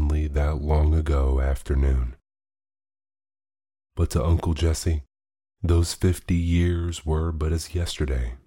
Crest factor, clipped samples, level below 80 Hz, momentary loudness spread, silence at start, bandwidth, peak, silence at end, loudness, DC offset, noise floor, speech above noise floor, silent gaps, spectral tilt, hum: 14 dB; under 0.1%; -28 dBFS; 6 LU; 0 s; 16 kHz; -10 dBFS; 0.1 s; -25 LUFS; under 0.1%; under -90 dBFS; over 68 dB; none; -6.5 dB/octave; none